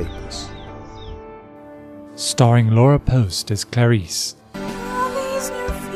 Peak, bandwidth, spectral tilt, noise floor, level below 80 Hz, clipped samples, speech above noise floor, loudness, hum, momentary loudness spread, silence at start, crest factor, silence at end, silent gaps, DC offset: 0 dBFS; 14.5 kHz; -5.5 dB/octave; -39 dBFS; -38 dBFS; under 0.1%; 24 dB; -19 LUFS; none; 24 LU; 0 s; 18 dB; 0 s; none; under 0.1%